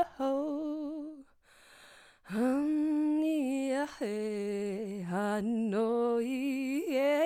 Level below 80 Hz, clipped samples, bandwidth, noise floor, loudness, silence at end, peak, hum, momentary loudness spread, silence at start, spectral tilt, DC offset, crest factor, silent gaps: -72 dBFS; under 0.1%; 15 kHz; -61 dBFS; -32 LUFS; 0 s; -18 dBFS; none; 8 LU; 0 s; -6 dB/octave; under 0.1%; 14 dB; none